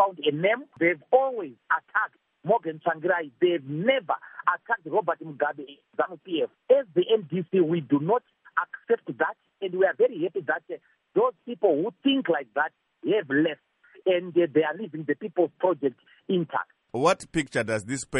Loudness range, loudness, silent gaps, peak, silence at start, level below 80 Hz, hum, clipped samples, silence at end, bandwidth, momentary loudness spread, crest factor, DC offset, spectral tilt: 2 LU; -26 LUFS; none; -8 dBFS; 0 s; -66 dBFS; none; under 0.1%; 0 s; 11 kHz; 8 LU; 18 dB; under 0.1%; -5.5 dB/octave